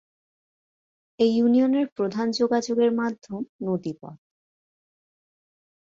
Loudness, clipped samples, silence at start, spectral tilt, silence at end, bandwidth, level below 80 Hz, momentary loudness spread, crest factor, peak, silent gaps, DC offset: -24 LUFS; under 0.1%; 1.2 s; -6 dB/octave; 1.7 s; 7.6 kHz; -70 dBFS; 14 LU; 18 dB; -8 dBFS; 1.92-1.96 s, 3.49-3.59 s; under 0.1%